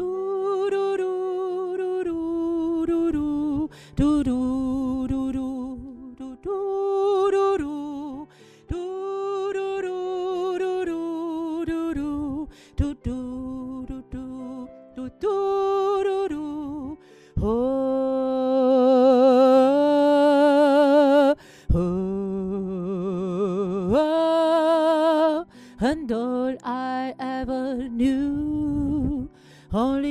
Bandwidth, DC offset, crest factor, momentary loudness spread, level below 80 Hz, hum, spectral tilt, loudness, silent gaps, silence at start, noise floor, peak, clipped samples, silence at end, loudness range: 12 kHz; under 0.1%; 14 dB; 17 LU; -42 dBFS; none; -7.5 dB/octave; -23 LUFS; none; 0 s; -45 dBFS; -8 dBFS; under 0.1%; 0 s; 10 LU